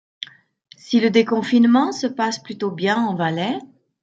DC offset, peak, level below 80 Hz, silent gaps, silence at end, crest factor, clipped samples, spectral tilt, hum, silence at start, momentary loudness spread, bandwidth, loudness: under 0.1%; -4 dBFS; -70 dBFS; none; 0.35 s; 16 dB; under 0.1%; -5.5 dB/octave; none; 0.2 s; 14 LU; 7.8 kHz; -19 LUFS